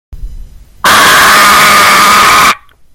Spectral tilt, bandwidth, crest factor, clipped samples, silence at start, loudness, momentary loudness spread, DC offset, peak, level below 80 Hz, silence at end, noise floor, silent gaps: -0.5 dB/octave; over 20 kHz; 6 dB; 4%; 0.1 s; -3 LUFS; 6 LU; under 0.1%; 0 dBFS; -30 dBFS; 0.4 s; -28 dBFS; none